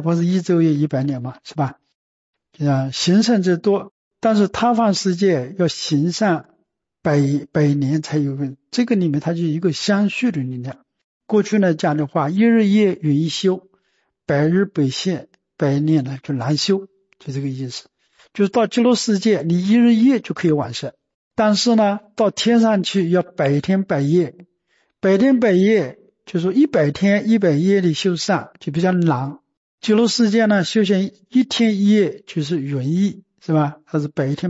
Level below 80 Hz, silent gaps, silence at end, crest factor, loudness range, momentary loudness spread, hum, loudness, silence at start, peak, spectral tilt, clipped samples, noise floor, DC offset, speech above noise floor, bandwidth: -60 dBFS; 1.95-2.33 s, 3.91-4.11 s, 11.04-11.21 s, 21.14-21.31 s, 29.57-29.78 s; 0 s; 12 dB; 3 LU; 11 LU; none; -18 LUFS; 0 s; -6 dBFS; -6 dB/octave; under 0.1%; -68 dBFS; under 0.1%; 50 dB; 8 kHz